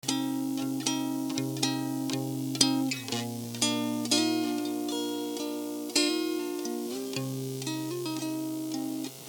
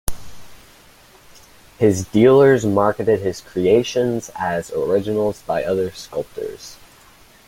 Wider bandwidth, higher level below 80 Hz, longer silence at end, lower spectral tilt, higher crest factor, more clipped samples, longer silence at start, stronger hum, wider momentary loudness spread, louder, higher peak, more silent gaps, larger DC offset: first, over 20 kHz vs 16.5 kHz; second, -80 dBFS vs -44 dBFS; second, 0 s vs 0.75 s; second, -3.5 dB/octave vs -6 dB/octave; first, 26 dB vs 18 dB; neither; about the same, 0.05 s vs 0.1 s; neither; second, 8 LU vs 16 LU; second, -30 LUFS vs -18 LUFS; about the same, -4 dBFS vs -2 dBFS; neither; neither